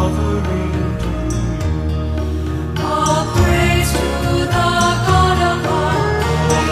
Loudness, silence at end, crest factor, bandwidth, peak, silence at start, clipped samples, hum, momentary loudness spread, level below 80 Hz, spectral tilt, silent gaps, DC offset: -17 LUFS; 0 s; 14 dB; 15.5 kHz; -2 dBFS; 0 s; under 0.1%; none; 7 LU; -24 dBFS; -5.5 dB/octave; none; under 0.1%